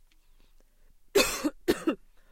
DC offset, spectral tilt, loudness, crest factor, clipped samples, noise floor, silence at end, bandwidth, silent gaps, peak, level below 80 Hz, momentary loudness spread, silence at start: under 0.1%; -2.5 dB/octave; -29 LUFS; 24 dB; under 0.1%; -58 dBFS; 0.35 s; 16.5 kHz; none; -8 dBFS; -54 dBFS; 8 LU; 1.15 s